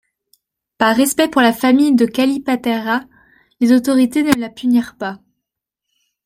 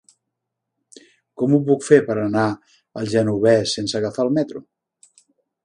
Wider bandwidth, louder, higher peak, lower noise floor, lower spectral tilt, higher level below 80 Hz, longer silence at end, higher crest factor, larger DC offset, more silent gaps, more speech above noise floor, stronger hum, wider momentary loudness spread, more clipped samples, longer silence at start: first, 16 kHz vs 11 kHz; first, -15 LUFS vs -19 LUFS; about the same, 0 dBFS vs 0 dBFS; about the same, -80 dBFS vs -80 dBFS; second, -4 dB/octave vs -6 dB/octave; about the same, -56 dBFS vs -60 dBFS; about the same, 1.1 s vs 1.05 s; about the same, 16 dB vs 20 dB; neither; neither; first, 66 dB vs 62 dB; neither; second, 8 LU vs 14 LU; neither; second, 0.8 s vs 1.4 s